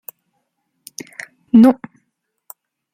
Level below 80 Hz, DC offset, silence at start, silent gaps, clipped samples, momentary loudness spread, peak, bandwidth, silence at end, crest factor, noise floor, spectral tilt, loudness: -62 dBFS; under 0.1%; 1.55 s; none; under 0.1%; 25 LU; -2 dBFS; 16.5 kHz; 1.2 s; 18 dB; -72 dBFS; -6.5 dB/octave; -13 LUFS